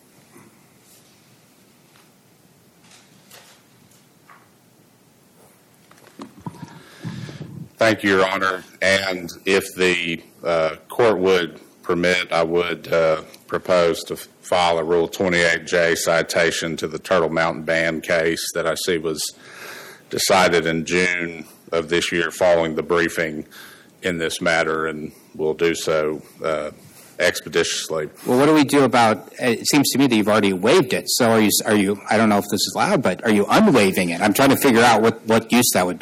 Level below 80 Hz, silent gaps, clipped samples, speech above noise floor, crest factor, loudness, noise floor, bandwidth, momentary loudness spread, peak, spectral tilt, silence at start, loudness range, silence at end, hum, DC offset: -56 dBFS; none; under 0.1%; 35 dB; 14 dB; -19 LUFS; -54 dBFS; 17 kHz; 13 LU; -6 dBFS; -4 dB/octave; 6.2 s; 6 LU; 0.05 s; none; under 0.1%